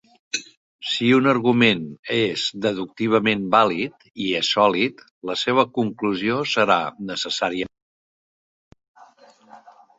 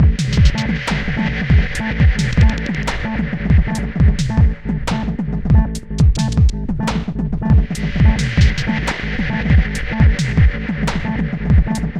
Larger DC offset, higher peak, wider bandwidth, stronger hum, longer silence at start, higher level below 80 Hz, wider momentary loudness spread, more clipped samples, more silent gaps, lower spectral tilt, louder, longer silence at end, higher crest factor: neither; about the same, -2 dBFS vs 0 dBFS; second, 8 kHz vs 11 kHz; neither; first, 0.35 s vs 0 s; second, -62 dBFS vs -18 dBFS; first, 12 LU vs 6 LU; neither; first, 0.57-0.79 s, 1.99-2.03 s, 5.11-5.21 s, 7.82-8.71 s, 8.88-8.95 s vs none; second, -4.5 dB/octave vs -6.5 dB/octave; second, -21 LUFS vs -17 LUFS; first, 0.3 s vs 0 s; first, 20 dB vs 14 dB